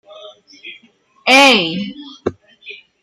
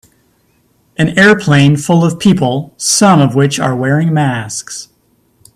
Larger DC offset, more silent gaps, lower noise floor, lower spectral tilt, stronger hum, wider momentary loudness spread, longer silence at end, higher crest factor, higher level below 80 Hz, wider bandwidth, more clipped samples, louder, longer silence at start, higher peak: neither; neither; second, -51 dBFS vs -55 dBFS; second, -2.5 dB/octave vs -5 dB/octave; neither; first, 27 LU vs 13 LU; second, 0.25 s vs 0.7 s; first, 18 dB vs 12 dB; second, -60 dBFS vs -48 dBFS; first, 15.5 kHz vs 13.5 kHz; neither; about the same, -11 LUFS vs -11 LUFS; second, 0.2 s vs 1 s; about the same, 0 dBFS vs 0 dBFS